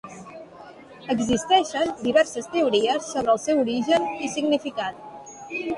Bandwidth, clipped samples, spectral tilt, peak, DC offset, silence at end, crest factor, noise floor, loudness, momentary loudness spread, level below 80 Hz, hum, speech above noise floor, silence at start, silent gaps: 11.5 kHz; under 0.1%; -3.5 dB/octave; -6 dBFS; under 0.1%; 0 s; 18 dB; -44 dBFS; -23 LUFS; 20 LU; -58 dBFS; none; 22 dB; 0.05 s; none